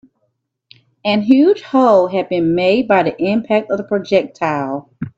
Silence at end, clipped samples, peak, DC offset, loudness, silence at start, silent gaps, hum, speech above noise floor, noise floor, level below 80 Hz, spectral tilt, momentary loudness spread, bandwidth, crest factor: 0.1 s; under 0.1%; 0 dBFS; under 0.1%; -15 LUFS; 1.05 s; none; none; 54 dB; -69 dBFS; -58 dBFS; -7 dB/octave; 8 LU; 7.8 kHz; 16 dB